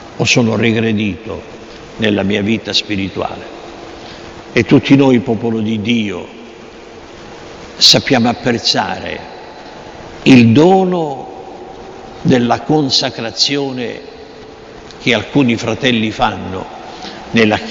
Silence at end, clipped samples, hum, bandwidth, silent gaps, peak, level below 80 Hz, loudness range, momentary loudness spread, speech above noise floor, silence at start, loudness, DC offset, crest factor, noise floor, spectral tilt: 0 s; 0.1%; none; 11 kHz; none; 0 dBFS; -44 dBFS; 5 LU; 24 LU; 21 dB; 0 s; -13 LUFS; under 0.1%; 14 dB; -34 dBFS; -4.5 dB/octave